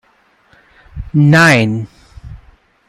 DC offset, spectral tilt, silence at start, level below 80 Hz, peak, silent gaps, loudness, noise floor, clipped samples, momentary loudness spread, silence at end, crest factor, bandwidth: under 0.1%; -6 dB/octave; 0.95 s; -38 dBFS; 0 dBFS; none; -11 LUFS; -54 dBFS; under 0.1%; 23 LU; 0.55 s; 16 dB; 14.5 kHz